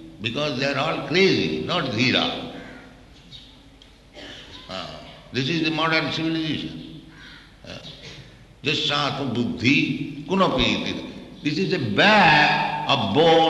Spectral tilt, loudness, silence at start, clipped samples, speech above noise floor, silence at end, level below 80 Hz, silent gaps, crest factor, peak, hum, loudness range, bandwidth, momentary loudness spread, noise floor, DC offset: -5 dB/octave; -21 LUFS; 0 s; under 0.1%; 28 dB; 0 s; -50 dBFS; none; 20 dB; -4 dBFS; none; 8 LU; 12 kHz; 22 LU; -49 dBFS; under 0.1%